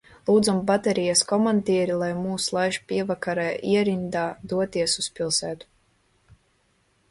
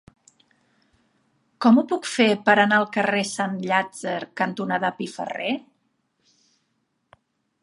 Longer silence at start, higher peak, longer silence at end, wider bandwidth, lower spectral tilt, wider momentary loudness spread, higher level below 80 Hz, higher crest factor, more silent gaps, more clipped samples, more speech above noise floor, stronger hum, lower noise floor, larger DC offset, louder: second, 0.25 s vs 1.6 s; second, -8 dBFS vs -2 dBFS; second, 1.55 s vs 2 s; about the same, 11.5 kHz vs 11.5 kHz; about the same, -4 dB/octave vs -4.5 dB/octave; second, 7 LU vs 12 LU; first, -60 dBFS vs -74 dBFS; about the same, 18 dB vs 22 dB; neither; neither; second, 43 dB vs 51 dB; neither; second, -66 dBFS vs -73 dBFS; neither; about the same, -24 LUFS vs -22 LUFS